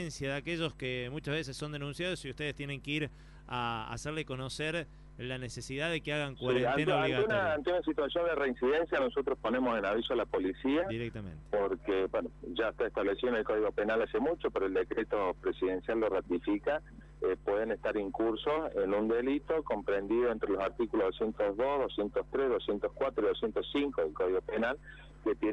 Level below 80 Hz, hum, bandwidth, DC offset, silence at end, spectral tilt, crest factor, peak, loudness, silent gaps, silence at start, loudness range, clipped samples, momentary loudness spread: -54 dBFS; none; 11.5 kHz; under 0.1%; 0 s; -5.5 dB/octave; 16 dB; -16 dBFS; -33 LUFS; none; 0 s; 6 LU; under 0.1%; 8 LU